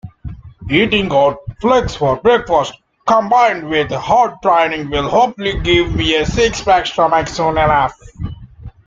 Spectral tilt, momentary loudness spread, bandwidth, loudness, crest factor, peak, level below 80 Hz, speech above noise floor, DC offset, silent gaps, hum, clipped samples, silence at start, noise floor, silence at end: -5 dB/octave; 15 LU; 7.8 kHz; -14 LUFS; 14 dB; 0 dBFS; -34 dBFS; 21 dB; under 0.1%; none; none; under 0.1%; 0.05 s; -35 dBFS; 0.15 s